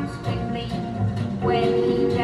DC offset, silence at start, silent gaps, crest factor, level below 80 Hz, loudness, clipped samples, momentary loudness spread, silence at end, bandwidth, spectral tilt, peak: under 0.1%; 0 s; none; 14 dB; -42 dBFS; -24 LUFS; under 0.1%; 7 LU; 0 s; 11.5 kHz; -8 dB/octave; -10 dBFS